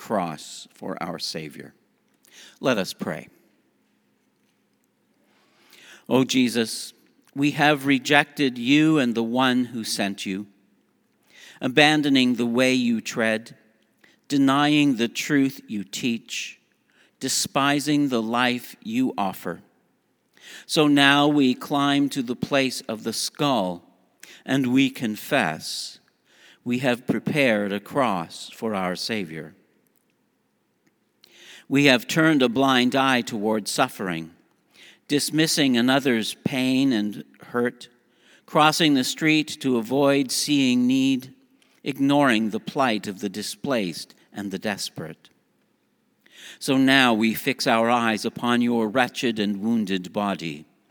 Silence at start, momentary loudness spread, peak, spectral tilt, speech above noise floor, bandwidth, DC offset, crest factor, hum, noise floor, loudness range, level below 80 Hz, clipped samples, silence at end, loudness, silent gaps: 0 s; 14 LU; 0 dBFS; -4 dB/octave; 47 dB; over 20 kHz; under 0.1%; 24 dB; none; -69 dBFS; 9 LU; -72 dBFS; under 0.1%; 0.3 s; -22 LUFS; none